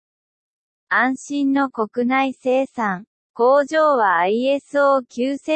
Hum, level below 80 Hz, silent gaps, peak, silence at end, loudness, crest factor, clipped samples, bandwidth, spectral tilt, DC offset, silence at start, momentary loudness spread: none; -74 dBFS; 3.07-3.34 s; -6 dBFS; 0 s; -19 LUFS; 14 dB; under 0.1%; 8.8 kHz; -5 dB/octave; under 0.1%; 0.9 s; 8 LU